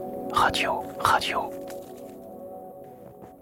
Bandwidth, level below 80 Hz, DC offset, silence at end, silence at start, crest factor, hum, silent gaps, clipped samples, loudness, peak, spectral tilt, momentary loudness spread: 17 kHz; -54 dBFS; under 0.1%; 0 s; 0 s; 24 dB; none; none; under 0.1%; -25 LUFS; -4 dBFS; -3 dB/octave; 22 LU